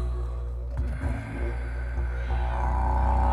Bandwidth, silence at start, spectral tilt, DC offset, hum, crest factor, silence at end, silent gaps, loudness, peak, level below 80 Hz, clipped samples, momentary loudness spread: 4.8 kHz; 0 s; -8 dB/octave; under 0.1%; none; 12 dB; 0 s; none; -30 LUFS; -14 dBFS; -28 dBFS; under 0.1%; 8 LU